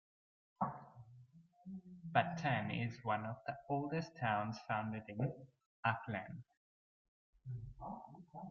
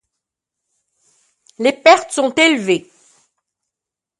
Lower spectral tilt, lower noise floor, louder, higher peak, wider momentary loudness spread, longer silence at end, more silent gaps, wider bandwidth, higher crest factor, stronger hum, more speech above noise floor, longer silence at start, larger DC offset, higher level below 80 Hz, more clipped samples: first, -5 dB/octave vs -3 dB/octave; second, -64 dBFS vs -85 dBFS; second, -41 LUFS vs -14 LUFS; second, -18 dBFS vs 0 dBFS; first, 18 LU vs 8 LU; second, 0 s vs 1.4 s; first, 5.66-5.83 s, 6.57-7.33 s vs none; second, 7 kHz vs 11.5 kHz; first, 26 dB vs 18 dB; neither; second, 23 dB vs 72 dB; second, 0.6 s vs 1.6 s; neither; about the same, -70 dBFS vs -68 dBFS; neither